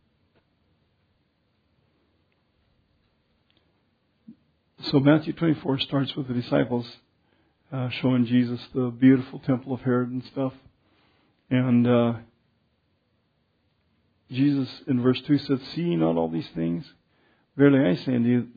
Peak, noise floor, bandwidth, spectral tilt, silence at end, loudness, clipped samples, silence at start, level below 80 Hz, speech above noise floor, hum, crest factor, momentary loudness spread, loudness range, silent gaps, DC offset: -6 dBFS; -70 dBFS; 5 kHz; -9.5 dB/octave; 0.05 s; -24 LUFS; under 0.1%; 4.3 s; -62 dBFS; 47 dB; none; 20 dB; 11 LU; 3 LU; none; under 0.1%